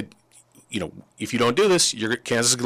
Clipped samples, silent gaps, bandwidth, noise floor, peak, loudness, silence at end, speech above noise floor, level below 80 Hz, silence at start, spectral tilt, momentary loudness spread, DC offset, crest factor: under 0.1%; none; 15.5 kHz; -55 dBFS; -10 dBFS; -21 LUFS; 0 s; 33 dB; -60 dBFS; 0 s; -2.5 dB/octave; 17 LU; under 0.1%; 14 dB